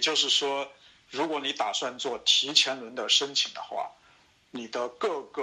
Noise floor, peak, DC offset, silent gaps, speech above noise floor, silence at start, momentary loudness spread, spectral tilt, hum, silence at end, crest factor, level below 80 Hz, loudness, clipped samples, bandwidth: -61 dBFS; -6 dBFS; under 0.1%; none; 32 dB; 0 s; 15 LU; 0 dB/octave; none; 0 s; 24 dB; -76 dBFS; -26 LUFS; under 0.1%; 15.5 kHz